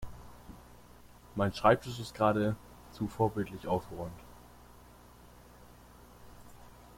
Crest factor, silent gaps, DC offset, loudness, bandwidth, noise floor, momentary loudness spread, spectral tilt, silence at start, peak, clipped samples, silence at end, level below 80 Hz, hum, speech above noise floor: 24 dB; none; under 0.1%; -32 LUFS; 16.5 kHz; -56 dBFS; 28 LU; -6.5 dB/octave; 0 s; -10 dBFS; under 0.1%; 0.25 s; -56 dBFS; 60 Hz at -55 dBFS; 25 dB